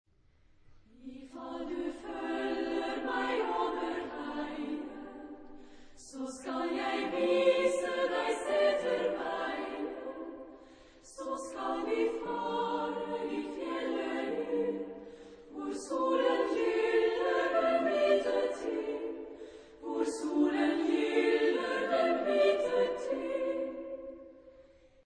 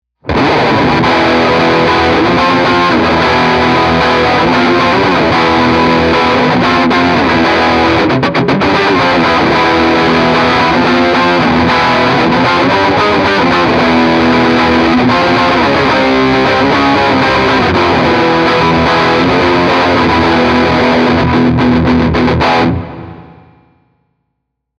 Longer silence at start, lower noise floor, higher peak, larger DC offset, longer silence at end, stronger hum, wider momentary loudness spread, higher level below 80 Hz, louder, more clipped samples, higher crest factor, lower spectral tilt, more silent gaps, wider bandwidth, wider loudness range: first, 0.7 s vs 0.25 s; second, -65 dBFS vs -70 dBFS; second, -14 dBFS vs 0 dBFS; neither; second, 0.45 s vs 1.55 s; neither; first, 18 LU vs 1 LU; second, -64 dBFS vs -34 dBFS; second, -32 LUFS vs -9 LUFS; neither; first, 18 dB vs 10 dB; second, -4 dB/octave vs -6 dB/octave; neither; about the same, 10 kHz vs 10.5 kHz; first, 7 LU vs 0 LU